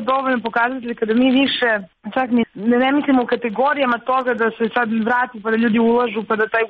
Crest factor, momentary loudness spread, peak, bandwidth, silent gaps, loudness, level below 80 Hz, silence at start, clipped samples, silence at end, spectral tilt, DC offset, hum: 12 dB; 5 LU; -6 dBFS; 4.9 kHz; none; -18 LUFS; -60 dBFS; 0 s; under 0.1%; 0 s; -7.5 dB/octave; under 0.1%; none